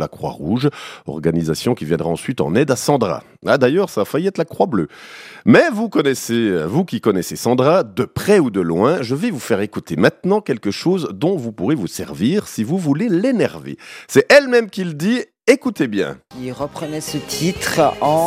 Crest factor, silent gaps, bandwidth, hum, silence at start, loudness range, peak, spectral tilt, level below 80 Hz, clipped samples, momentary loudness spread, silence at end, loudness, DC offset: 18 dB; none; 16 kHz; none; 0 s; 3 LU; 0 dBFS; -5.5 dB/octave; -54 dBFS; under 0.1%; 11 LU; 0 s; -17 LUFS; under 0.1%